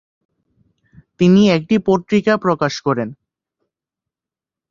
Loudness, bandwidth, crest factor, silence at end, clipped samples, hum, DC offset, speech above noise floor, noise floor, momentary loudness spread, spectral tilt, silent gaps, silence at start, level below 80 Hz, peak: -16 LUFS; 7.4 kHz; 18 dB; 1.55 s; under 0.1%; none; under 0.1%; 74 dB; -88 dBFS; 9 LU; -6.5 dB/octave; none; 1.2 s; -54 dBFS; -2 dBFS